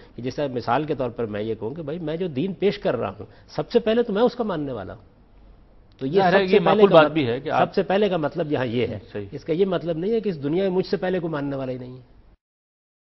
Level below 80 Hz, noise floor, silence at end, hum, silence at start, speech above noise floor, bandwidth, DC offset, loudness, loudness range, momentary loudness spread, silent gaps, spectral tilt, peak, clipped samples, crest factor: -52 dBFS; -50 dBFS; 1.1 s; none; 0 s; 28 dB; 6 kHz; under 0.1%; -22 LUFS; 7 LU; 14 LU; none; -8 dB/octave; 0 dBFS; under 0.1%; 22 dB